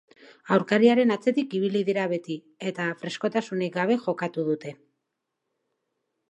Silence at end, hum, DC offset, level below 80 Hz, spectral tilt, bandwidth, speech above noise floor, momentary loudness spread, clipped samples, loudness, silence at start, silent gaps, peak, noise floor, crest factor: 1.55 s; none; under 0.1%; -80 dBFS; -6.5 dB/octave; 8.6 kHz; 57 dB; 12 LU; under 0.1%; -25 LUFS; 0.45 s; none; -6 dBFS; -82 dBFS; 20 dB